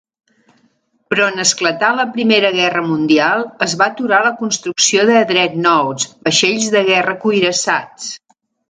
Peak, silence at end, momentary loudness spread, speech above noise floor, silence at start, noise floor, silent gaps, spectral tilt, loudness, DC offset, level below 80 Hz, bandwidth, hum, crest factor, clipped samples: 0 dBFS; 0.55 s; 7 LU; 45 dB; 1.1 s; -60 dBFS; none; -2.5 dB/octave; -14 LUFS; under 0.1%; -62 dBFS; 9.6 kHz; none; 16 dB; under 0.1%